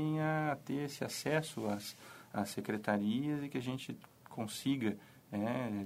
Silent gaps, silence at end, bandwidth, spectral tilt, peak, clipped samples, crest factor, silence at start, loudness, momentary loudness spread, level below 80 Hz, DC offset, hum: none; 0 s; 16 kHz; -5.5 dB/octave; -18 dBFS; under 0.1%; 20 dB; 0 s; -38 LUFS; 12 LU; -76 dBFS; under 0.1%; none